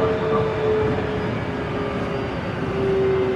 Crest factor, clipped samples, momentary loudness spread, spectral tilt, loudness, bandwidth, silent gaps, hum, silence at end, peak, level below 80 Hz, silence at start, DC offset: 12 dB; under 0.1%; 6 LU; -7.5 dB/octave; -23 LUFS; 9.6 kHz; none; none; 0 s; -10 dBFS; -40 dBFS; 0 s; under 0.1%